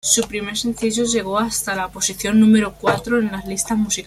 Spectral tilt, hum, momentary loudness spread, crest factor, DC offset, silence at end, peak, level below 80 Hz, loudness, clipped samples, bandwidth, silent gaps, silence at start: -3.5 dB/octave; none; 9 LU; 18 dB; under 0.1%; 0 s; -2 dBFS; -46 dBFS; -19 LUFS; under 0.1%; 15 kHz; none; 0.05 s